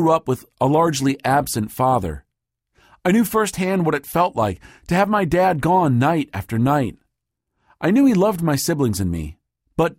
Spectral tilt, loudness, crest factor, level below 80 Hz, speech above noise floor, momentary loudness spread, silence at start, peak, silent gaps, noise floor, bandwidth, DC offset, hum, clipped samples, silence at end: -6 dB/octave; -19 LUFS; 16 dB; -44 dBFS; 60 dB; 9 LU; 0 s; -4 dBFS; none; -79 dBFS; 16.5 kHz; under 0.1%; none; under 0.1%; 0.05 s